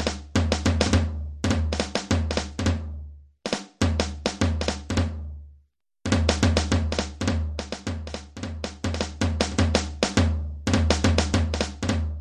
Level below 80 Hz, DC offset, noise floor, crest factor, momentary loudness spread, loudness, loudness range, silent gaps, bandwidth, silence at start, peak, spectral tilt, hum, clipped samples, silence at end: -30 dBFS; under 0.1%; -61 dBFS; 22 dB; 12 LU; -25 LUFS; 4 LU; none; 11 kHz; 0 s; -4 dBFS; -5 dB/octave; none; under 0.1%; 0 s